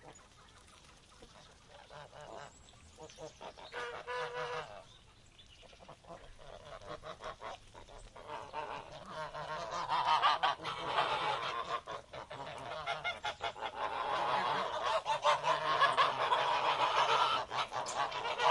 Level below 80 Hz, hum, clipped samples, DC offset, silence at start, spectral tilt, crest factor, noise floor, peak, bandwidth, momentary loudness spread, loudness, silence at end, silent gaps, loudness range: -66 dBFS; none; under 0.1%; under 0.1%; 0 s; -2 dB/octave; 22 dB; -60 dBFS; -14 dBFS; 11.5 kHz; 23 LU; -35 LUFS; 0 s; none; 19 LU